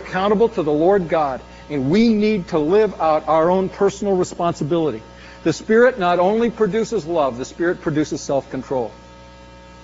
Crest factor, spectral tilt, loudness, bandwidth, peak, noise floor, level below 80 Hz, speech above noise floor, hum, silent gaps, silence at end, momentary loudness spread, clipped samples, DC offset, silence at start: 14 dB; -5.5 dB/octave; -19 LUFS; 8 kHz; -4 dBFS; -41 dBFS; -46 dBFS; 24 dB; none; none; 0 s; 9 LU; under 0.1%; under 0.1%; 0 s